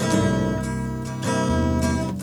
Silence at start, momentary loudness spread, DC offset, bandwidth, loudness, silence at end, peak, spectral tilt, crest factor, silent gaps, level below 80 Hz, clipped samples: 0 s; 7 LU; under 0.1%; over 20 kHz; -23 LUFS; 0 s; -6 dBFS; -6 dB/octave; 16 dB; none; -36 dBFS; under 0.1%